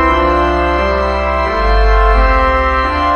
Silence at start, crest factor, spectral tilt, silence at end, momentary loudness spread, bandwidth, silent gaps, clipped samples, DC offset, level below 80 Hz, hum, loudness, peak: 0 s; 12 dB; -7 dB/octave; 0 s; 3 LU; 6.6 kHz; none; under 0.1%; under 0.1%; -16 dBFS; none; -12 LUFS; 0 dBFS